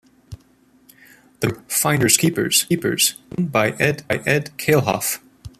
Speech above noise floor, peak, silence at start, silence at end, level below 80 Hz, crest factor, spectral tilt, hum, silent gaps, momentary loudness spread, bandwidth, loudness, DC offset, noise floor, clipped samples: 36 dB; 0 dBFS; 0.3 s; 0.1 s; -52 dBFS; 22 dB; -3.5 dB/octave; none; none; 10 LU; 15 kHz; -19 LUFS; under 0.1%; -55 dBFS; under 0.1%